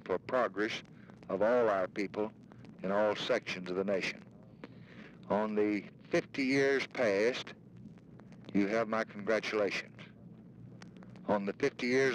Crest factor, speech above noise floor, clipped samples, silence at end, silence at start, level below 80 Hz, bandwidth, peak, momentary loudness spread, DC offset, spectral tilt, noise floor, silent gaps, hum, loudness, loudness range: 16 dB; 21 dB; under 0.1%; 0 s; 0 s; -72 dBFS; 10.5 kHz; -18 dBFS; 23 LU; under 0.1%; -5 dB/octave; -54 dBFS; none; none; -33 LUFS; 3 LU